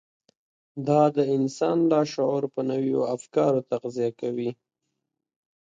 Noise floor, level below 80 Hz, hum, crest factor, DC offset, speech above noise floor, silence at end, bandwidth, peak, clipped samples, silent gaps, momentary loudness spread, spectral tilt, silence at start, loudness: -82 dBFS; -74 dBFS; none; 18 dB; under 0.1%; 58 dB; 1.15 s; 9.2 kHz; -8 dBFS; under 0.1%; none; 9 LU; -7 dB/octave; 0.75 s; -25 LUFS